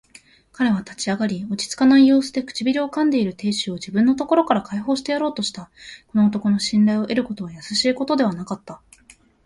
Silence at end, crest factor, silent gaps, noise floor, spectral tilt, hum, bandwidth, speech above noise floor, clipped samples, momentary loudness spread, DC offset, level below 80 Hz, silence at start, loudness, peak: 0.7 s; 18 dB; none; -53 dBFS; -5 dB/octave; none; 11.5 kHz; 33 dB; under 0.1%; 13 LU; under 0.1%; -58 dBFS; 0.6 s; -20 LUFS; -2 dBFS